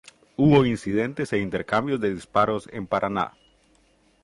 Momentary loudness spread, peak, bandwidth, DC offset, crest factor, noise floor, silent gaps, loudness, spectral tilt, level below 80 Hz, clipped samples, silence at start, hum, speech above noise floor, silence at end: 10 LU; -6 dBFS; 11.5 kHz; under 0.1%; 18 dB; -61 dBFS; none; -24 LUFS; -7 dB/octave; -52 dBFS; under 0.1%; 0.4 s; none; 39 dB; 0.95 s